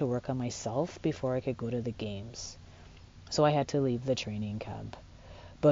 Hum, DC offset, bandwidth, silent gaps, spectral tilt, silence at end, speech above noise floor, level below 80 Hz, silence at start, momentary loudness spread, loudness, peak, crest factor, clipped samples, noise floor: none; under 0.1%; 7.4 kHz; none; -6 dB/octave; 0 s; 20 dB; -56 dBFS; 0 s; 23 LU; -33 LUFS; -14 dBFS; 20 dB; under 0.1%; -52 dBFS